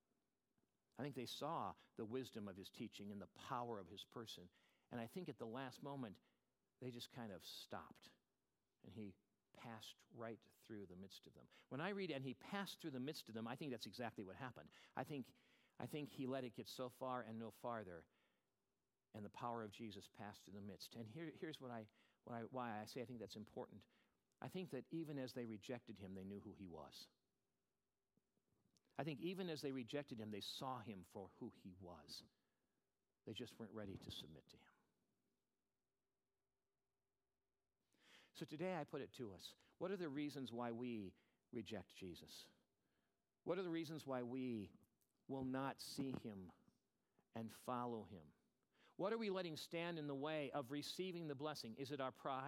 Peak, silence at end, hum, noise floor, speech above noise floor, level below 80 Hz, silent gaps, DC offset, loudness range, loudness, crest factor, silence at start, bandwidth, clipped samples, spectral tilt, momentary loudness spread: -28 dBFS; 0 s; none; under -90 dBFS; over 39 dB; -86 dBFS; none; under 0.1%; 9 LU; -52 LUFS; 24 dB; 0.95 s; 16.5 kHz; under 0.1%; -5.5 dB/octave; 12 LU